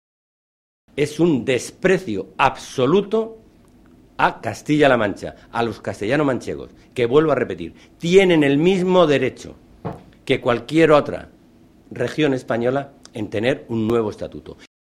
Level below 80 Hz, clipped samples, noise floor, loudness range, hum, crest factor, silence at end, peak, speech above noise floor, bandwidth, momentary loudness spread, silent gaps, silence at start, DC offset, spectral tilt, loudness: -50 dBFS; under 0.1%; -50 dBFS; 4 LU; none; 20 dB; 0.35 s; 0 dBFS; 32 dB; 13.5 kHz; 18 LU; none; 0.95 s; under 0.1%; -6 dB/octave; -19 LUFS